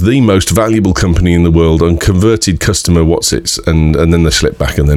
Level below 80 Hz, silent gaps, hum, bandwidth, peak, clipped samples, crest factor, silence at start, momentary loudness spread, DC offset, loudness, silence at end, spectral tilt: -20 dBFS; none; none; 16 kHz; 0 dBFS; under 0.1%; 10 dB; 0 s; 3 LU; under 0.1%; -10 LUFS; 0 s; -5.5 dB/octave